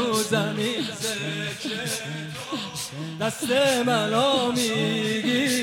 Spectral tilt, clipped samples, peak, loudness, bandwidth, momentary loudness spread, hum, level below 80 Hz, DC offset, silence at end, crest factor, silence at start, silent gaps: -3.5 dB/octave; under 0.1%; -10 dBFS; -24 LUFS; 17 kHz; 10 LU; none; -66 dBFS; under 0.1%; 0 s; 16 dB; 0 s; none